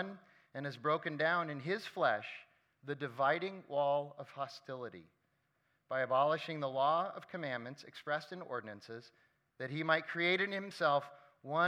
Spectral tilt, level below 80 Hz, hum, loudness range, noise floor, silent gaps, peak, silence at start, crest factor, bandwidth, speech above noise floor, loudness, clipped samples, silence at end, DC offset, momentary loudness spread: -6 dB/octave; under -90 dBFS; none; 3 LU; -79 dBFS; none; -16 dBFS; 0 s; 22 dB; 12.5 kHz; 42 dB; -36 LUFS; under 0.1%; 0 s; under 0.1%; 17 LU